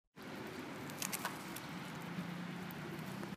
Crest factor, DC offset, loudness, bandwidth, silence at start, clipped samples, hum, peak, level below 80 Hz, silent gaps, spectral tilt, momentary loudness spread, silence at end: 28 dB; under 0.1%; -45 LUFS; 15.5 kHz; 0.15 s; under 0.1%; none; -18 dBFS; -74 dBFS; none; -4 dB/octave; 6 LU; 0 s